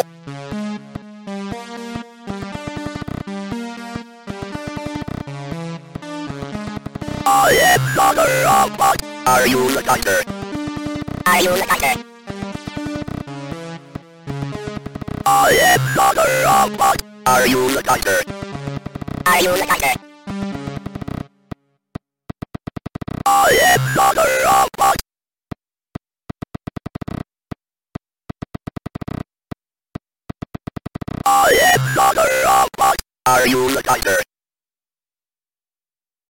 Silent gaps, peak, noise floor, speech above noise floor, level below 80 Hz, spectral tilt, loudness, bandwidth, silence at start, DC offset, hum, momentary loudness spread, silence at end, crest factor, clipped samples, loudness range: none; -2 dBFS; under -90 dBFS; over 75 dB; -42 dBFS; -3.5 dB/octave; -16 LUFS; 17 kHz; 0 s; under 0.1%; none; 22 LU; 2.05 s; 18 dB; under 0.1%; 16 LU